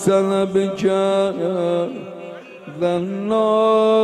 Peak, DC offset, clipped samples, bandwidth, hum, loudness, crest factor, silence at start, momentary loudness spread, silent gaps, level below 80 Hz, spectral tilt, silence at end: -6 dBFS; under 0.1%; under 0.1%; 13 kHz; none; -19 LUFS; 14 dB; 0 s; 18 LU; none; -62 dBFS; -6 dB/octave; 0 s